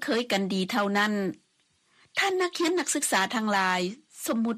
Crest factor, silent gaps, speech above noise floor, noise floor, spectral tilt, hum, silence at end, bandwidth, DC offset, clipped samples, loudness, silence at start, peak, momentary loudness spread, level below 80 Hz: 16 dB; none; 42 dB; -69 dBFS; -3.5 dB/octave; none; 0 s; 15.5 kHz; under 0.1%; under 0.1%; -27 LUFS; 0 s; -12 dBFS; 7 LU; -74 dBFS